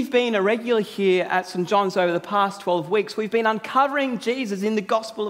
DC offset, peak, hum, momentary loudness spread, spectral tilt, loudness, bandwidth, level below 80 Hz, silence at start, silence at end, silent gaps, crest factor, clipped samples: under 0.1%; -6 dBFS; none; 5 LU; -5 dB/octave; -22 LUFS; 16 kHz; -74 dBFS; 0 s; 0 s; none; 16 dB; under 0.1%